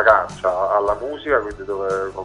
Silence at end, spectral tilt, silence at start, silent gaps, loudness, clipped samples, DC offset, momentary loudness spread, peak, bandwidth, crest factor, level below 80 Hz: 0 s; -5 dB/octave; 0 s; none; -20 LUFS; under 0.1%; under 0.1%; 8 LU; 0 dBFS; 10.5 kHz; 20 dB; -46 dBFS